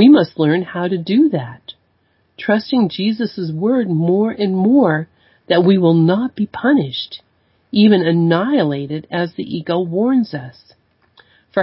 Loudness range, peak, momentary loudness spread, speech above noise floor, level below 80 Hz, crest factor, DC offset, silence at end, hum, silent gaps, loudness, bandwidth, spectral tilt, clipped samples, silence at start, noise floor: 4 LU; 0 dBFS; 12 LU; 46 dB; -58 dBFS; 16 dB; under 0.1%; 0 s; none; none; -16 LUFS; 5.8 kHz; -12 dB/octave; under 0.1%; 0 s; -61 dBFS